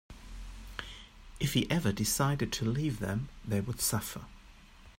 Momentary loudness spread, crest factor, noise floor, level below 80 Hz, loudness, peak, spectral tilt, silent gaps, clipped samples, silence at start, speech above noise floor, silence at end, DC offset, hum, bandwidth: 20 LU; 18 dB; -54 dBFS; -50 dBFS; -32 LUFS; -16 dBFS; -4.5 dB/octave; none; under 0.1%; 0.1 s; 23 dB; 0.05 s; under 0.1%; none; 16 kHz